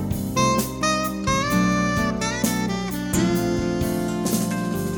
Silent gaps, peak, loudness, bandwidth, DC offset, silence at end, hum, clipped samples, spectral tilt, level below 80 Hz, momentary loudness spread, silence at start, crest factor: none; -6 dBFS; -22 LUFS; over 20 kHz; under 0.1%; 0 s; none; under 0.1%; -4.5 dB/octave; -40 dBFS; 4 LU; 0 s; 16 dB